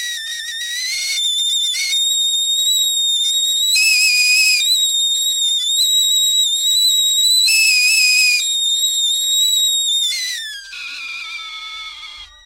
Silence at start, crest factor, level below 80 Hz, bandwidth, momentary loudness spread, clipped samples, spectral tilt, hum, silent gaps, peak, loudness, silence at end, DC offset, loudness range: 0 s; 14 dB; -58 dBFS; 16 kHz; 16 LU; under 0.1%; 7 dB/octave; none; none; -2 dBFS; -13 LUFS; 0.2 s; under 0.1%; 4 LU